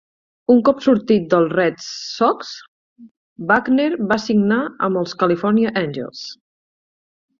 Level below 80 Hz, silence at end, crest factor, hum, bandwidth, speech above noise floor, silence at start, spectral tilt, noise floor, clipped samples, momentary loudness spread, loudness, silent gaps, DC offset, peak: -60 dBFS; 1.05 s; 16 dB; none; 7.4 kHz; over 73 dB; 0.5 s; -6 dB/octave; under -90 dBFS; under 0.1%; 14 LU; -18 LUFS; 2.68-2.96 s, 3.11-3.36 s; under 0.1%; -2 dBFS